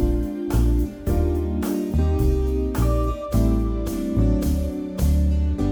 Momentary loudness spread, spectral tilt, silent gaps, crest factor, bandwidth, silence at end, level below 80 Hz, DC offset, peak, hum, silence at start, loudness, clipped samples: 4 LU; -8 dB/octave; none; 12 dB; over 20 kHz; 0 s; -24 dBFS; under 0.1%; -8 dBFS; none; 0 s; -23 LUFS; under 0.1%